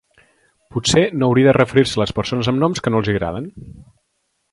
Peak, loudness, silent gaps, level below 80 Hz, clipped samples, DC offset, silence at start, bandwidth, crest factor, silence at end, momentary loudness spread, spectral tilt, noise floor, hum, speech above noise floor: 0 dBFS; -17 LUFS; none; -44 dBFS; under 0.1%; under 0.1%; 0.75 s; 11.5 kHz; 18 dB; 0.7 s; 12 LU; -5.5 dB/octave; -70 dBFS; none; 53 dB